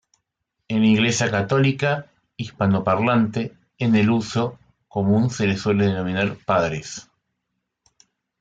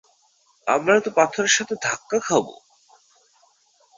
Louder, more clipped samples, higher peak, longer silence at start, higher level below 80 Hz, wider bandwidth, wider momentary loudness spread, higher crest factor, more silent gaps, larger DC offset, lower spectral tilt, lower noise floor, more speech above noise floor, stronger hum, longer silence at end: about the same, -21 LUFS vs -21 LUFS; neither; second, -6 dBFS vs -2 dBFS; about the same, 0.7 s vs 0.65 s; first, -56 dBFS vs -68 dBFS; first, 9.2 kHz vs 8 kHz; first, 12 LU vs 8 LU; second, 16 dB vs 22 dB; neither; neither; first, -6 dB/octave vs -2 dB/octave; first, -78 dBFS vs -62 dBFS; first, 58 dB vs 41 dB; neither; about the same, 1.4 s vs 1.45 s